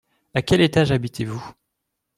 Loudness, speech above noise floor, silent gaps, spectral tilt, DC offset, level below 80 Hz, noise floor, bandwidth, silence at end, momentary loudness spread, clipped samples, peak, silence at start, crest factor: -21 LUFS; 59 dB; none; -6 dB/octave; under 0.1%; -46 dBFS; -79 dBFS; 14.5 kHz; 0.65 s; 15 LU; under 0.1%; -4 dBFS; 0.35 s; 18 dB